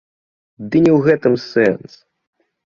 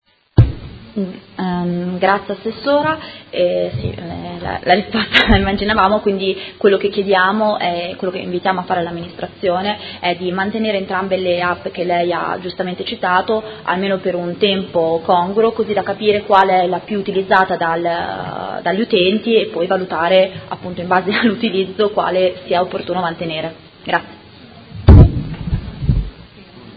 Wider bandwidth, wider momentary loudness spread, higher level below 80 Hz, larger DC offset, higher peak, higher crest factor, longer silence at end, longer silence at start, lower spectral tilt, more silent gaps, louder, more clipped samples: about the same, 7.2 kHz vs 7.6 kHz; about the same, 12 LU vs 11 LU; second, -54 dBFS vs -26 dBFS; neither; about the same, -2 dBFS vs 0 dBFS; about the same, 16 dB vs 16 dB; first, 0.95 s vs 0 s; first, 0.6 s vs 0.35 s; about the same, -8 dB/octave vs -8.5 dB/octave; neither; about the same, -15 LUFS vs -17 LUFS; second, under 0.1% vs 0.1%